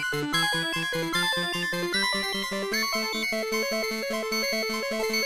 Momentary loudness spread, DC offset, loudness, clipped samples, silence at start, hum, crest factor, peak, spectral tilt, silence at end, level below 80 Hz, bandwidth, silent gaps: 4 LU; 0.2%; -26 LUFS; under 0.1%; 0 s; none; 14 dB; -14 dBFS; -2.5 dB/octave; 0 s; -58 dBFS; 15.5 kHz; none